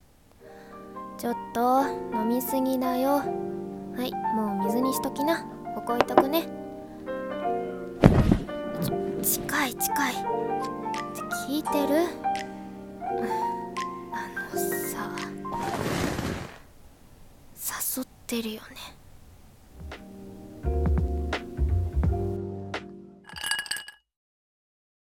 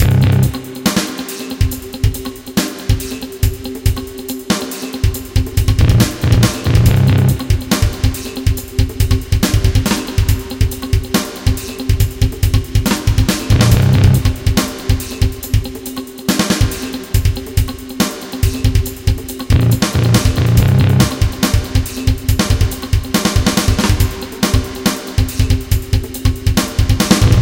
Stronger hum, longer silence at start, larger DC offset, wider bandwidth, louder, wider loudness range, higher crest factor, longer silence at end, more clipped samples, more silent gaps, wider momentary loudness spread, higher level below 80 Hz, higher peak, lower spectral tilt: neither; first, 0.4 s vs 0 s; neither; about the same, 17.5 kHz vs 17.5 kHz; second, -28 LUFS vs -15 LUFS; first, 8 LU vs 5 LU; first, 26 dB vs 14 dB; first, 1.25 s vs 0 s; neither; neither; first, 16 LU vs 8 LU; second, -38 dBFS vs -20 dBFS; about the same, -2 dBFS vs 0 dBFS; about the same, -5 dB/octave vs -5 dB/octave